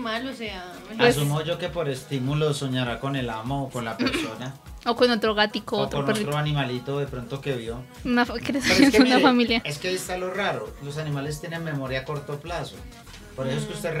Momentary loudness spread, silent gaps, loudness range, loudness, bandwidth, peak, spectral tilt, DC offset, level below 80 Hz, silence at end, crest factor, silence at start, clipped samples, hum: 15 LU; none; 8 LU; -25 LUFS; 16 kHz; -4 dBFS; -5 dB/octave; under 0.1%; -48 dBFS; 0 s; 20 dB; 0 s; under 0.1%; none